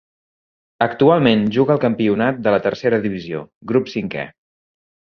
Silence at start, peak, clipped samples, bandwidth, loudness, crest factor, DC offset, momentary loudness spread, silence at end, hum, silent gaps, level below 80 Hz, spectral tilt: 0.8 s; -2 dBFS; under 0.1%; 6.6 kHz; -18 LUFS; 16 dB; under 0.1%; 13 LU; 0.75 s; none; 3.55-3.61 s; -56 dBFS; -8 dB/octave